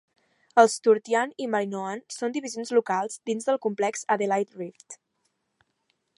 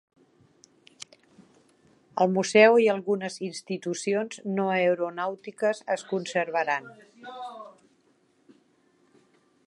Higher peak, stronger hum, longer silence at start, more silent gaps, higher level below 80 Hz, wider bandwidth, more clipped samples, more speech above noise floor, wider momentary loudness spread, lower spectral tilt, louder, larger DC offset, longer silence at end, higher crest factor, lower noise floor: about the same, -2 dBFS vs -4 dBFS; neither; second, 0.55 s vs 2.15 s; neither; about the same, -84 dBFS vs -82 dBFS; about the same, 11.5 kHz vs 11.5 kHz; neither; first, 50 dB vs 41 dB; second, 14 LU vs 26 LU; about the same, -4 dB/octave vs -4.5 dB/octave; about the same, -25 LUFS vs -25 LUFS; neither; second, 1.25 s vs 1.95 s; about the same, 24 dB vs 24 dB; first, -75 dBFS vs -66 dBFS